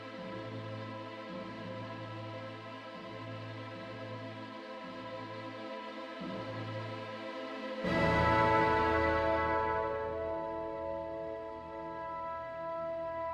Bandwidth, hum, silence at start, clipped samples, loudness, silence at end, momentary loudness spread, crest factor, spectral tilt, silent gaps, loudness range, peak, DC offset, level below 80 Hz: 12 kHz; none; 0 s; under 0.1%; -36 LUFS; 0 s; 15 LU; 22 dB; -7 dB/octave; none; 13 LU; -14 dBFS; under 0.1%; -56 dBFS